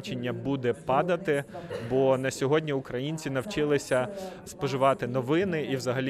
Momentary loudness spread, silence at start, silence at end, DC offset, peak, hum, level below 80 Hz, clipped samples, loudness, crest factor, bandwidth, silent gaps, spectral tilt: 8 LU; 0 s; 0 s; under 0.1%; -12 dBFS; none; -60 dBFS; under 0.1%; -28 LUFS; 16 dB; 14.5 kHz; none; -6 dB/octave